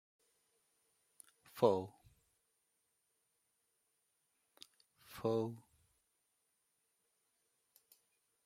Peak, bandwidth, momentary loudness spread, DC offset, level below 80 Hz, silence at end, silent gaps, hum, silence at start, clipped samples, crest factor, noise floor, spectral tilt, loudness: -16 dBFS; 16.5 kHz; 27 LU; under 0.1%; -84 dBFS; 2.85 s; none; none; 1.55 s; under 0.1%; 30 dB; -83 dBFS; -7 dB/octave; -37 LUFS